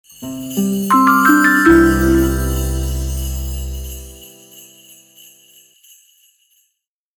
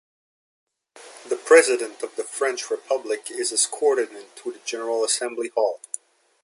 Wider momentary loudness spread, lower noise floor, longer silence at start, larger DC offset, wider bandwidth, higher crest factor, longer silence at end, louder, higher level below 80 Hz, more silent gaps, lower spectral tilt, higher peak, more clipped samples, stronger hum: about the same, 19 LU vs 18 LU; first, -72 dBFS vs -48 dBFS; second, 0.2 s vs 0.95 s; neither; first, over 20 kHz vs 11.5 kHz; second, 16 dB vs 22 dB; first, 2.6 s vs 0.65 s; first, -14 LUFS vs -23 LUFS; first, -26 dBFS vs -84 dBFS; neither; first, -5.5 dB/octave vs 0.5 dB/octave; about the same, -2 dBFS vs -2 dBFS; neither; neither